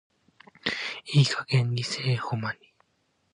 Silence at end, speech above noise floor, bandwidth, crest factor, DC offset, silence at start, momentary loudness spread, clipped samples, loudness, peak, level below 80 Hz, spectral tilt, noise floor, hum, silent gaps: 0.8 s; 46 dB; 10.5 kHz; 20 dB; under 0.1%; 0.65 s; 10 LU; under 0.1%; -27 LUFS; -10 dBFS; -68 dBFS; -5 dB/octave; -72 dBFS; none; none